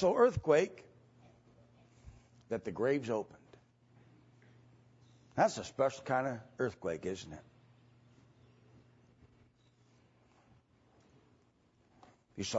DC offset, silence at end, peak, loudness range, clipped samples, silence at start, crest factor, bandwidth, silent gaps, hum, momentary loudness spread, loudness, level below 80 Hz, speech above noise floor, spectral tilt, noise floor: under 0.1%; 0 s; -14 dBFS; 8 LU; under 0.1%; 0 s; 24 dB; 7.6 kHz; none; none; 19 LU; -34 LUFS; -66 dBFS; 37 dB; -4.5 dB/octave; -70 dBFS